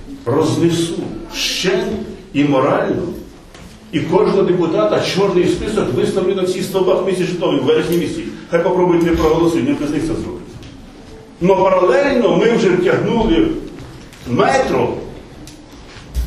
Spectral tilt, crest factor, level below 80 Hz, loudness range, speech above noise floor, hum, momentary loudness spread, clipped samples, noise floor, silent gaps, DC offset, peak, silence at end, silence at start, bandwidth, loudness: -5.5 dB/octave; 16 dB; -36 dBFS; 3 LU; 23 dB; none; 16 LU; under 0.1%; -37 dBFS; none; under 0.1%; 0 dBFS; 0 s; 0 s; 13.5 kHz; -16 LUFS